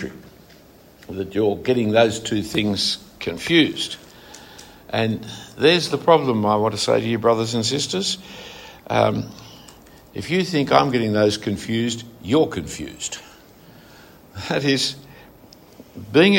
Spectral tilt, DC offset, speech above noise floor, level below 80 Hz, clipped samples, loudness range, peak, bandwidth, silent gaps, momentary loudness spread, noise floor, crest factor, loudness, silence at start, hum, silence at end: -4.5 dB/octave; under 0.1%; 28 dB; -54 dBFS; under 0.1%; 6 LU; -2 dBFS; 16.5 kHz; none; 20 LU; -48 dBFS; 20 dB; -20 LUFS; 0 s; none; 0 s